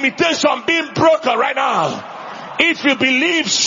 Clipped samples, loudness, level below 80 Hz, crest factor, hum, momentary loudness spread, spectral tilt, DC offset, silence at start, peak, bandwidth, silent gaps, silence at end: under 0.1%; -15 LUFS; -60 dBFS; 16 dB; none; 13 LU; -2.5 dB/octave; under 0.1%; 0 s; 0 dBFS; 7.6 kHz; none; 0 s